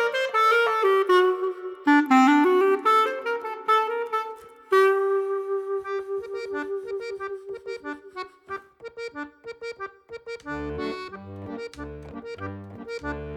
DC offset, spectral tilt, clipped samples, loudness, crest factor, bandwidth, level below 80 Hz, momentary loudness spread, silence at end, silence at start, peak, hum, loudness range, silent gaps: under 0.1%; -5 dB/octave; under 0.1%; -23 LUFS; 18 dB; 15 kHz; -54 dBFS; 19 LU; 0 s; 0 s; -8 dBFS; none; 15 LU; none